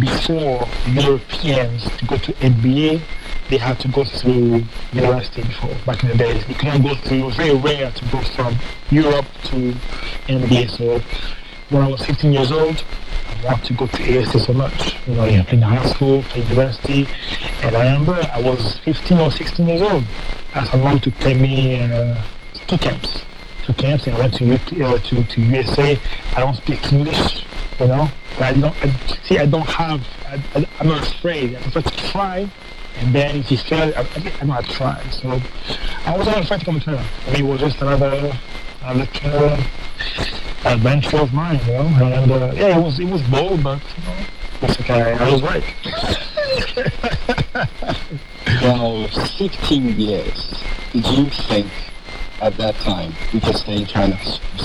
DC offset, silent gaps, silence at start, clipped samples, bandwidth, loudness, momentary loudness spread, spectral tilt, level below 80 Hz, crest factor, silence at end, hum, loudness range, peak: under 0.1%; none; 0 s; under 0.1%; 11.5 kHz; -18 LUFS; 10 LU; -7 dB/octave; -28 dBFS; 16 dB; 0 s; none; 4 LU; 0 dBFS